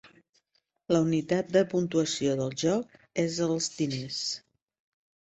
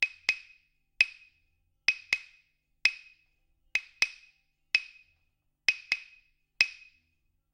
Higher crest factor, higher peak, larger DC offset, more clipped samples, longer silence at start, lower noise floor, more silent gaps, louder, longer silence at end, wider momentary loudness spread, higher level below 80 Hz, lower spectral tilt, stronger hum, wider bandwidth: second, 20 dB vs 32 dB; second, -10 dBFS vs -2 dBFS; neither; neither; about the same, 0.05 s vs 0 s; about the same, -75 dBFS vs -76 dBFS; first, 0.29-0.33 s vs none; about the same, -28 LUFS vs -29 LUFS; about the same, 0.9 s vs 0.8 s; about the same, 6 LU vs 6 LU; about the same, -66 dBFS vs -70 dBFS; first, -5 dB/octave vs 2 dB/octave; neither; second, 8.2 kHz vs 16 kHz